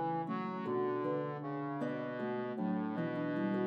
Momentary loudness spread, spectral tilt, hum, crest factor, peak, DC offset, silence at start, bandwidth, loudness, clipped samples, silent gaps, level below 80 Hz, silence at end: 4 LU; -9.5 dB/octave; none; 14 dB; -22 dBFS; under 0.1%; 0 s; 6 kHz; -38 LUFS; under 0.1%; none; under -90 dBFS; 0 s